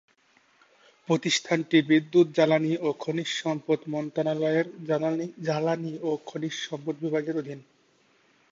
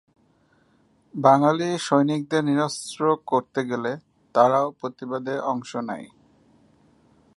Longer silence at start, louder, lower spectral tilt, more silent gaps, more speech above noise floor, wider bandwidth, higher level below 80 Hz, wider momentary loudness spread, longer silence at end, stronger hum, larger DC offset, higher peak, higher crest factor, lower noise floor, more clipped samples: about the same, 1.1 s vs 1.15 s; second, -27 LUFS vs -23 LUFS; about the same, -5 dB/octave vs -5.5 dB/octave; neither; about the same, 38 dB vs 40 dB; second, 7.8 kHz vs 11.5 kHz; about the same, -76 dBFS vs -72 dBFS; about the same, 11 LU vs 12 LU; second, 0.9 s vs 1.3 s; neither; neither; second, -8 dBFS vs -4 dBFS; about the same, 18 dB vs 22 dB; about the same, -64 dBFS vs -62 dBFS; neither